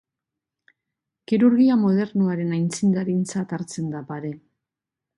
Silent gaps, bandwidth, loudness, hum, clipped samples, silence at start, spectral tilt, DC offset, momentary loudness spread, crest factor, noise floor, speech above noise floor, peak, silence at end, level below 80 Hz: none; 11.5 kHz; -22 LUFS; none; under 0.1%; 1.3 s; -7 dB/octave; under 0.1%; 15 LU; 16 dB; -87 dBFS; 66 dB; -6 dBFS; 0.8 s; -68 dBFS